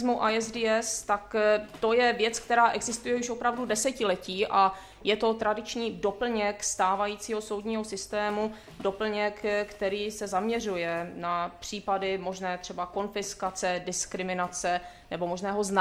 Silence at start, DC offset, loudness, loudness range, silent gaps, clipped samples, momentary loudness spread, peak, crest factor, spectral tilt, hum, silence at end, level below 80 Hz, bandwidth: 0 s; under 0.1%; -29 LUFS; 5 LU; none; under 0.1%; 8 LU; -10 dBFS; 20 dB; -3 dB/octave; none; 0 s; -58 dBFS; 15.5 kHz